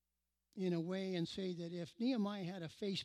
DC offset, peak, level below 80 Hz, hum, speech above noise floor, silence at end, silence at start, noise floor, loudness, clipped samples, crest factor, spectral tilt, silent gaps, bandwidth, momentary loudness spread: under 0.1%; -28 dBFS; -80 dBFS; none; 48 dB; 0 s; 0.55 s; -89 dBFS; -42 LUFS; under 0.1%; 14 dB; -6.5 dB/octave; none; 12.5 kHz; 8 LU